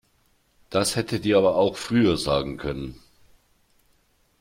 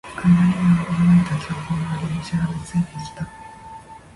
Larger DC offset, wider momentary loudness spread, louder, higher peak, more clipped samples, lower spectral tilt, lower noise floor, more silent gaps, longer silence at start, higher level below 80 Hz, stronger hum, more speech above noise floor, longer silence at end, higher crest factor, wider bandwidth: neither; second, 12 LU vs 23 LU; second, -23 LUFS vs -20 LUFS; about the same, -8 dBFS vs -6 dBFS; neither; second, -5 dB/octave vs -7.5 dB/octave; first, -65 dBFS vs -40 dBFS; neither; first, 0.7 s vs 0.05 s; about the same, -48 dBFS vs -44 dBFS; neither; first, 42 dB vs 19 dB; first, 1.45 s vs 0.2 s; about the same, 18 dB vs 16 dB; first, 16.5 kHz vs 11.5 kHz